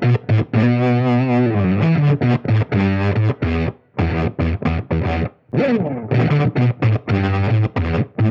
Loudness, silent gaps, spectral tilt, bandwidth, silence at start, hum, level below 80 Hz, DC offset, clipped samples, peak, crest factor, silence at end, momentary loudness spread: -18 LUFS; none; -9.5 dB/octave; 6 kHz; 0 s; none; -34 dBFS; under 0.1%; under 0.1%; -4 dBFS; 12 dB; 0 s; 5 LU